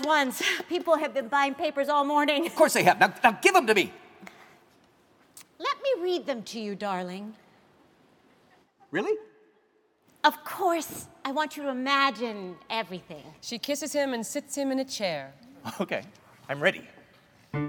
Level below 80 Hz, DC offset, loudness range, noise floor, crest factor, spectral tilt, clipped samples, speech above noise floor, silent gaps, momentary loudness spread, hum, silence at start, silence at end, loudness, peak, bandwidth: -74 dBFS; under 0.1%; 10 LU; -67 dBFS; 24 dB; -3.5 dB/octave; under 0.1%; 40 dB; none; 16 LU; none; 0 s; 0 s; -27 LUFS; -4 dBFS; 19 kHz